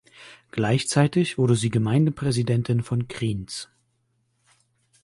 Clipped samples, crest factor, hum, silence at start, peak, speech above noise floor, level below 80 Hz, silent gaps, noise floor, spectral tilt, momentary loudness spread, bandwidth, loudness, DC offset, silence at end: under 0.1%; 18 dB; none; 0.2 s; -6 dBFS; 48 dB; -54 dBFS; none; -70 dBFS; -6 dB/octave; 12 LU; 11.5 kHz; -23 LUFS; under 0.1%; 1.4 s